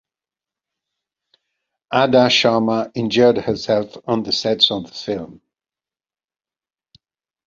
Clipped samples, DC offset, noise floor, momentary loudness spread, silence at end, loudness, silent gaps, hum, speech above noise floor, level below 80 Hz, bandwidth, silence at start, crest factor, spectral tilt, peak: under 0.1%; under 0.1%; under -90 dBFS; 13 LU; 2.15 s; -17 LUFS; none; none; over 73 dB; -58 dBFS; 7.6 kHz; 1.9 s; 20 dB; -4.5 dB/octave; 0 dBFS